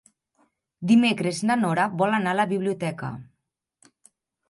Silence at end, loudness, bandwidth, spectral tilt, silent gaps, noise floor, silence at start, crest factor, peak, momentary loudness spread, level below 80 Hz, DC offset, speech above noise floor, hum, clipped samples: 1.25 s; -23 LUFS; 11.5 kHz; -5.5 dB/octave; none; -79 dBFS; 0.8 s; 18 dB; -8 dBFS; 15 LU; -68 dBFS; under 0.1%; 57 dB; none; under 0.1%